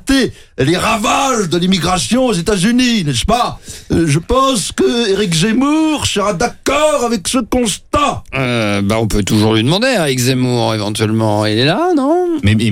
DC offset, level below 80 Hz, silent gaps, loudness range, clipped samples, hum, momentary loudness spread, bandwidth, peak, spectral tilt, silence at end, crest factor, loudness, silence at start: under 0.1%; -32 dBFS; none; 1 LU; under 0.1%; none; 4 LU; 17 kHz; 0 dBFS; -4.5 dB/octave; 0 s; 14 dB; -14 LUFS; 0.05 s